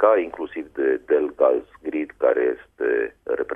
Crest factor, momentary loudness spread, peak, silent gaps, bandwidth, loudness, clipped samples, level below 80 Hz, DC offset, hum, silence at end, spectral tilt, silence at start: 18 dB; 10 LU; -4 dBFS; none; 3.7 kHz; -23 LUFS; under 0.1%; -60 dBFS; under 0.1%; none; 0 s; -7 dB/octave; 0 s